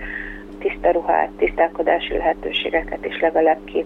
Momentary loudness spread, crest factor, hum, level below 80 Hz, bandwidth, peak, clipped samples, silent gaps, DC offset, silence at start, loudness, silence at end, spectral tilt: 10 LU; 16 dB; none; -40 dBFS; 5.2 kHz; -4 dBFS; under 0.1%; none; under 0.1%; 0 s; -20 LUFS; 0 s; -6 dB/octave